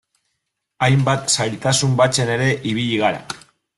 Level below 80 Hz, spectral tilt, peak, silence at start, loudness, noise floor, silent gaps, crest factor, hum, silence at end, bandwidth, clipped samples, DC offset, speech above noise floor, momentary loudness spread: -52 dBFS; -4 dB/octave; -2 dBFS; 0.8 s; -18 LUFS; -75 dBFS; none; 16 dB; none; 0.4 s; 12 kHz; under 0.1%; under 0.1%; 58 dB; 7 LU